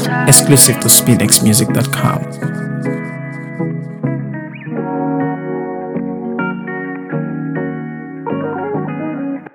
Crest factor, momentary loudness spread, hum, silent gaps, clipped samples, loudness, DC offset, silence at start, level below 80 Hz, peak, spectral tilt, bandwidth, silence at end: 16 dB; 16 LU; none; none; 0.4%; -14 LUFS; under 0.1%; 0 s; -52 dBFS; 0 dBFS; -4 dB/octave; over 20 kHz; 0.05 s